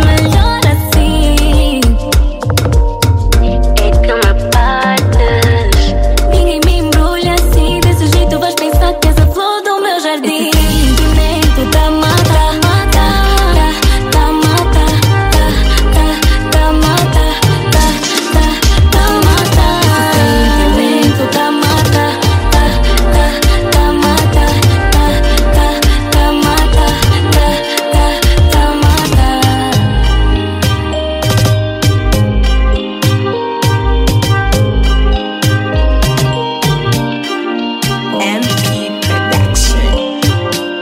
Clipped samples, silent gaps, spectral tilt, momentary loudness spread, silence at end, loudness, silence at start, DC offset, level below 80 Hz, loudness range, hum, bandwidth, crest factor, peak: under 0.1%; none; -5 dB/octave; 4 LU; 0 s; -11 LUFS; 0 s; under 0.1%; -12 dBFS; 3 LU; none; 16.5 kHz; 10 dB; 0 dBFS